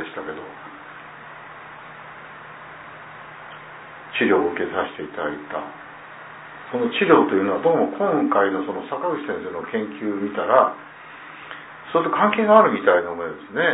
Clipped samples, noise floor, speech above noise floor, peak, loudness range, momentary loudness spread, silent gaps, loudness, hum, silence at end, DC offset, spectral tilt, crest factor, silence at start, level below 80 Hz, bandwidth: under 0.1%; -40 dBFS; 20 dB; 0 dBFS; 17 LU; 22 LU; none; -21 LUFS; none; 0 s; under 0.1%; -9.5 dB/octave; 22 dB; 0 s; -66 dBFS; 4 kHz